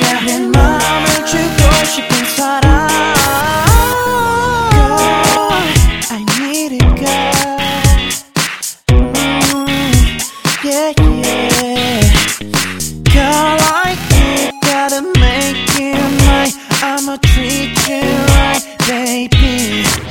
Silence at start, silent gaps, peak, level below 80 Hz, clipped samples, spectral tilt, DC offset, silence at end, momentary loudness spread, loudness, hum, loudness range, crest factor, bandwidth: 0 s; none; 0 dBFS; -18 dBFS; 0.2%; -4 dB/octave; 1%; 0 s; 5 LU; -12 LUFS; none; 2 LU; 12 dB; 19.5 kHz